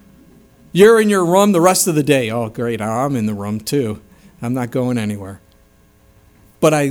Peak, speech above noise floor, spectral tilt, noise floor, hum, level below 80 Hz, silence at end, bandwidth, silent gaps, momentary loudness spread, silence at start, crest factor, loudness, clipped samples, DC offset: 0 dBFS; 36 dB; -5 dB/octave; -51 dBFS; none; -54 dBFS; 0 s; 19.5 kHz; none; 14 LU; 0.75 s; 16 dB; -16 LUFS; under 0.1%; under 0.1%